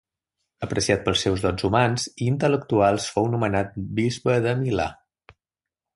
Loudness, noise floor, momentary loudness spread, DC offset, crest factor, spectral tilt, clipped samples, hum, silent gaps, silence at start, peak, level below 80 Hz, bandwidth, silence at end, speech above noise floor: -23 LUFS; -89 dBFS; 6 LU; under 0.1%; 20 dB; -5.5 dB/octave; under 0.1%; none; none; 0.6 s; -4 dBFS; -46 dBFS; 11.5 kHz; 1 s; 67 dB